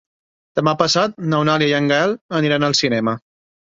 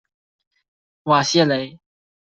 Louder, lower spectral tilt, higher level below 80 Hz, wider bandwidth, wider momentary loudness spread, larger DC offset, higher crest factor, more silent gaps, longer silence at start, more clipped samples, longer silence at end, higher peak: about the same, -17 LUFS vs -18 LUFS; about the same, -4.5 dB/octave vs -4.5 dB/octave; first, -58 dBFS vs -64 dBFS; about the same, 7.8 kHz vs 8.2 kHz; second, 5 LU vs 17 LU; neither; about the same, 16 dB vs 20 dB; first, 2.21-2.29 s vs none; second, 0.55 s vs 1.05 s; neither; about the same, 0.6 s vs 0.55 s; about the same, -2 dBFS vs -2 dBFS